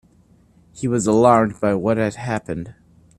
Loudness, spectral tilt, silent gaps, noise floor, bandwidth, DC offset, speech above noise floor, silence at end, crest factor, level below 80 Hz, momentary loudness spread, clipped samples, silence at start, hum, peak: -19 LUFS; -6.5 dB/octave; none; -54 dBFS; 12 kHz; under 0.1%; 36 dB; 0.45 s; 20 dB; -52 dBFS; 16 LU; under 0.1%; 0.75 s; none; 0 dBFS